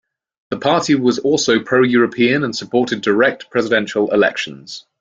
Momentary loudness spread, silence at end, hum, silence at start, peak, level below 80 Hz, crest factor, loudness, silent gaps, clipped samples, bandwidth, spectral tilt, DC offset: 9 LU; 0.2 s; none; 0.5 s; -2 dBFS; -58 dBFS; 16 dB; -16 LUFS; none; under 0.1%; 7.8 kHz; -4.5 dB/octave; under 0.1%